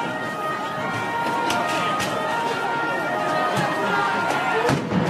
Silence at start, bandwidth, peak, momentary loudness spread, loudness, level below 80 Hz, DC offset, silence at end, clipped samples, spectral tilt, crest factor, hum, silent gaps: 0 s; 16 kHz; -8 dBFS; 5 LU; -23 LUFS; -56 dBFS; under 0.1%; 0 s; under 0.1%; -4.5 dB/octave; 16 dB; none; none